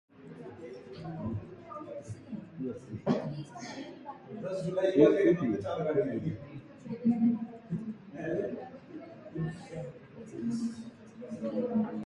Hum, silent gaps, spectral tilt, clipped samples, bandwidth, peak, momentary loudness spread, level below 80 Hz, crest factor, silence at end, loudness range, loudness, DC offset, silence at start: none; none; -8 dB/octave; under 0.1%; 10.5 kHz; -8 dBFS; 19 LU; -64 dBFS; 24 dB; 0 s; 10 LU; -33 LUFS; under 0.1%; 0.15 s